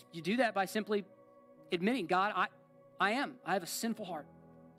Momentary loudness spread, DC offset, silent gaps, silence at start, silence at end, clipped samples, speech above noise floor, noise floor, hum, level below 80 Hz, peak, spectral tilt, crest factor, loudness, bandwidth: 7 LU; under 0.1%; none; 0.15 s; 0.1 s; under 0.1%; 25 dB; -60 dBFS; none; -82 dBFS; -18 dBFS; -4 dB/octave; 18 dB; -35 LUFS; 16 kHz